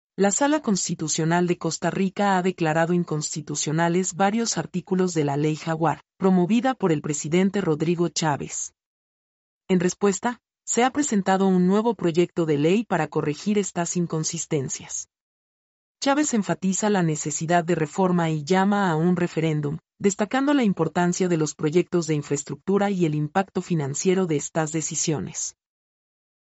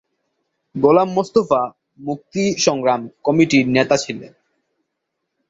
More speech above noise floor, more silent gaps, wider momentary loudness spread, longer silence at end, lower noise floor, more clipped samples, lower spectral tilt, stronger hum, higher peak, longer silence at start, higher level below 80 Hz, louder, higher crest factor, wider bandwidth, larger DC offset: first, over 67 dB vs 60 dB; first, 8.86-9.61 s, 15.21-15.95 s vs none; second, 6 LU vs 14 LU; second, 0.9 s vs 1.25 s; first, under -90 dBFS vs -77 dBFS; neither; about the same, -5 dB/octave vs -5 dB/octave; neither; second, -8 dBFS vs -2 dBFS; second, 0.2 s vs 0.75 s; second, -64 dBFS vs -58 dBFS; second, -23 LUFS vs -17 LUFS; about the same, 16 dB vs 18 dB; about the same, 8.2 kHz vs 8 kHz; neither